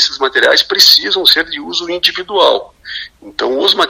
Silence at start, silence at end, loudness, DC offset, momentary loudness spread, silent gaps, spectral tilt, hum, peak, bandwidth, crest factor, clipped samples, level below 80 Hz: 0 s; 0 s; -10 LUFS; under 0.1%; 19 LU; none; 0 dB/octave; none; 0 dBFS; over 20 kHz; 12 dB; 0.8%; -50 dBFS